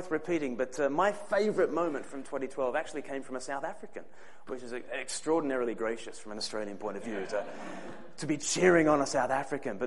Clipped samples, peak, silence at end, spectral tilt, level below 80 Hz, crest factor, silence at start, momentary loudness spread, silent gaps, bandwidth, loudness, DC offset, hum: under 0.1%; -10 dBFS; 0 s; -4 dB/octave; -66 dBFS; 22 dB; 0 s; 16 LU; none; 11.5 kHz; -32 LUFS; 0.7%; none